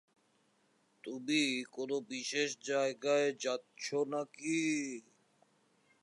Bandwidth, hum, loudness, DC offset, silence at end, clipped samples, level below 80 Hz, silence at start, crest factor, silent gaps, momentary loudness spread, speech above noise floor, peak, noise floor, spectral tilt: 11.5 kHz; none; -35 LUFS; under 0.1%; 1 s; under 0.1%; under -90 dBFS; 1.05 s; 18 dB; none; 11 LU; 38 dB; -20 dBFS; -74 dBFS; -3 dB/octave